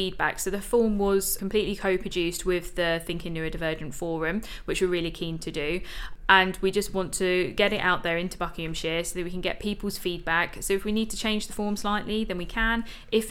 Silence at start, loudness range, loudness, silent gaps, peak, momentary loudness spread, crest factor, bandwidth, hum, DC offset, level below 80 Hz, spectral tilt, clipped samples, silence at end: 0 s; 4 LU; -27 LUFS; none; -2 dBFS; 8 LU; 24 dB; 17 kHz; none; under 0.1%; -40 dBFS; -4 dB/octave; under 0.1%; 0 s